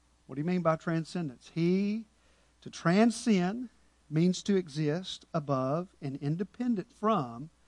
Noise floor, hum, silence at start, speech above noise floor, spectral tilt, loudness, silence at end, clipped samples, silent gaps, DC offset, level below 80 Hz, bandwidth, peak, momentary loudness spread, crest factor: -65 dBFS; none; 0.3 s; 35 dB; -6.5 dB/octave; -31 LUFS; 0.2 s; under 0.1%; none; under 0.1%; -68 dBFS; 11 kHz; -12 dBFS; 12 LU; 18 dB